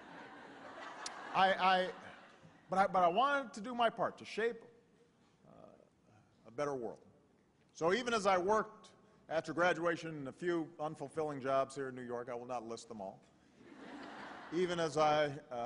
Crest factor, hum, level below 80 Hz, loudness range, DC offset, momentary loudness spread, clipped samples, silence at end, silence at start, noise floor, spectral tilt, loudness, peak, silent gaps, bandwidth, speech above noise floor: 22 dB; none; -74 dBFS; 9 LU; under 0.1%; 19 LU; under 0.1%; 0 s; 0 s; -70 dBFS; -4.5 dB/octave; -36 LUFS; -16 dBFS; none; 10.5 kHz; 35 dB